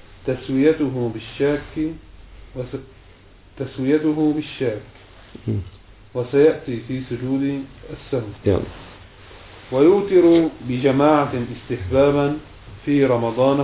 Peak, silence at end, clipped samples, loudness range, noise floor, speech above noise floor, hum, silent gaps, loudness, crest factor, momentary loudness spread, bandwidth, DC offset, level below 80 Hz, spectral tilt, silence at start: -2 dBFS; 0 s; under 0.1%; 7 LU; -47 dBFS; 28 dB; none; none; -20 LUFS; 18 dB; 17 LU; 4 kHz; under 0.1%; -44 dBFS; -11.5 dB/octave; 0.2 s